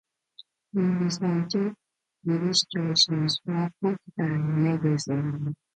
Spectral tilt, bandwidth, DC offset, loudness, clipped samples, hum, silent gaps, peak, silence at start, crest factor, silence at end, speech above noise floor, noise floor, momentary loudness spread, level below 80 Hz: -5 dB/octave; 9.4 kHz; under 0.1%; -26 LUFS; under 0.1%; none; none; -8 dBFS; 0.75 s; 20 dB; 0.2 s; 29 dB; -55 dBFS; 8 LU; -68 dBFS